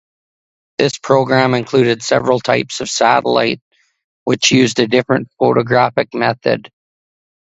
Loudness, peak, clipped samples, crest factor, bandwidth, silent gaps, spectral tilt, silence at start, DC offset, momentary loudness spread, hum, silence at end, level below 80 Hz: -14 LUFS; 0 dBFS; under 0.1%; 16 dB; 8.2 kHz; 3.61-3.71 s, 4.04-4.26 s; -4.5 dB/octave; 0.8 s; under 0.1%; 7 LU; none; 0.8 s; -54 dBFS